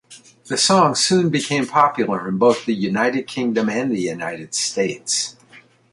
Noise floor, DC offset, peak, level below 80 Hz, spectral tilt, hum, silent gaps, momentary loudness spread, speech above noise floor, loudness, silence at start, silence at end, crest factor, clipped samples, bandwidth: -49 dBFS; under 0.1%; -2 dBFS; -62 dBFS; -3.5 dB/octave; none; none; 8 LU; 30 dB; -19 LUFS; 0.1 s; 0.35 s; 18 dB; under 0.1%; 11.5 kHz